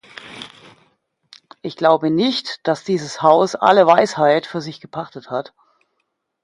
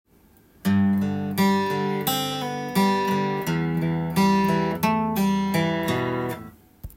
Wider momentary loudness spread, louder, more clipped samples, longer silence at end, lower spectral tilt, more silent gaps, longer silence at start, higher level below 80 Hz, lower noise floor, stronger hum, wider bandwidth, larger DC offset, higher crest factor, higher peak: first, 21 LU vs 6 LU; first, -17 LUFS vs -23 LUFS; neither; first, 1 s vs 0.05 s; about the same, -5 dB/octave vs -6 dB/octave; neither; second, 0.25 s vs 0.65 s; second, -66 dBFS vs -54 dBFS; first, -72 dBFS vs -56 dBFS; neither; second, 11.5 kHz vs 16.5 kHz; neither; about the same, 18 dB vs 14 dB; first, 0 dBFS vs -10 dBFS